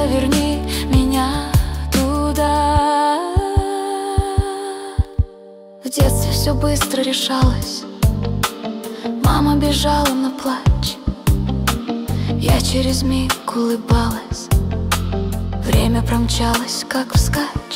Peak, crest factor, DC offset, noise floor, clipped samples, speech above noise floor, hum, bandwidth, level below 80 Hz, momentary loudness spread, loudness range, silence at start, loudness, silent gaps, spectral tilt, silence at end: -4 dBFS; 14 dB; under 0.1%; -40 dBFS; under 0.1%; 23 dB; none; 16.5 kHz; -24 dBFS; 7 LU; 2 LU; 0 s; -18 LUFS; none; -5 dB/octave; 0 s